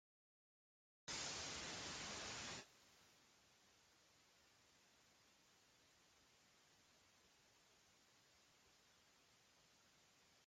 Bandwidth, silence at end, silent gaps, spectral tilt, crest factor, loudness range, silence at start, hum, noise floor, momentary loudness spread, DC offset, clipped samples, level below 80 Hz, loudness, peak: 15 kHz; 0 s; none; -1 dB/octave; 24 dB; 7 LU; 1.05 s; none; -75 dBFS; 18 LU; under 0.1%; under 0.1%; -80 dBFS; -50 LUFS; -36 dBFS